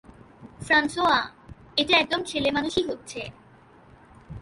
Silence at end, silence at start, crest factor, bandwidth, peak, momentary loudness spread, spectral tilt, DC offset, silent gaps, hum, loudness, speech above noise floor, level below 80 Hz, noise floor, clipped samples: 0 s; 0.1 s; 20 dB; 11.5 kHz; -6 dBFS; 17 LU; -3.5 dB/octave; under 0.1%; none; none; -23 LUFS; 29 dB; -54 dBFS; -53 dBFS; under 0.1%